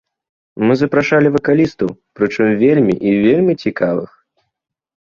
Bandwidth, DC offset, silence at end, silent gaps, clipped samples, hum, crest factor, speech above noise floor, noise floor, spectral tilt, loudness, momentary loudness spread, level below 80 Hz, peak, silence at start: 7.2 kHz; under 0.1%; 1 s; none; under 0.1%; none; 14 dB; 64 dB; -77 dBFS; -8 dB/octave; -14 LUFS; 9 LU; -52 dBFS; -2 dBFS; 0.55 s